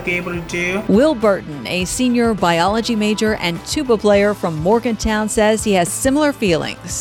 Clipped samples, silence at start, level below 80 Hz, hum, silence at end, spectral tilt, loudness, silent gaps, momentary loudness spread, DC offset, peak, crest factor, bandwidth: under 0.1%; 0 s; -38 dBFS; none; 0 s; -4.5 dB/octave; -17 LUFS; none; 7 LU; under 0.1%; -4 dBFS; 14 dB; 19 kHz